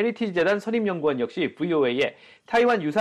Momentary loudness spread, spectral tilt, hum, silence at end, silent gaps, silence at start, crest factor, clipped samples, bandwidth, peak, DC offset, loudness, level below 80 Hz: 6 LU; -6 dB/octave; none; 0 s; none; 0 s; 14 dB; under 0.1%; 10.5 kHz; -10 dBFS; under 0.1%; -24 LUFS; -68 dBFS